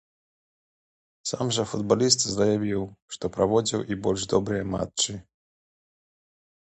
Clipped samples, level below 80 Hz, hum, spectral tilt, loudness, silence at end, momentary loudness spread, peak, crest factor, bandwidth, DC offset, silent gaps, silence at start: under 0.1%; -54 dBFS; none; -4 dB/octave; -25 LUFS; 1.45 s; 12 LU; -4 dBFS; 22 dB; 9 kHz; under 0.1%; 3.02-3.08 s; 1.25 s